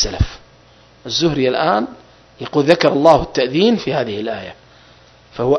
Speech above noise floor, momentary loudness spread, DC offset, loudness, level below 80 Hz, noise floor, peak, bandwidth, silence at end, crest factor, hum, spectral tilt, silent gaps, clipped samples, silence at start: 32 dB; 16 LU; under 0.1%; -16 LUFS; -34 dBFS; -48 dBFS; 0 dBFS; 11 kHz; 0 s; 18 dB; none; -5 dB/octave; none; under 0.1%; 0 s